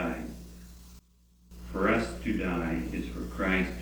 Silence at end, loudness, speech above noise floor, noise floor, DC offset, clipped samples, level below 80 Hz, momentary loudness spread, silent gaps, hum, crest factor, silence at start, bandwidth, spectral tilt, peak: 0 s; -31 LUFS; 31 dB; -61 dBFS; under 0.1%; under 0.1%; -42 dBFS; 22 LU; none; none; 18 dB; 0 s; over 20 kHz; -6.5 dB/octave; -14 dBFS